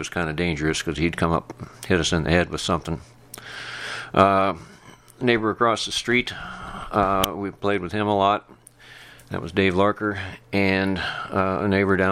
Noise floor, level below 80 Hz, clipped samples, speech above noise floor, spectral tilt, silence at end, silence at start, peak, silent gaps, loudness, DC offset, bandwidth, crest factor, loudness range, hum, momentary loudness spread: -48 dBFS; -44 dBFS; under 0.1%; 25 dB; -5 dB/octave; 0 s; 0 s; 0 dBFS; none; -23 LUFS; under 0.1%; 18 kHz; 22 dB; 2 LU; none; 14 LU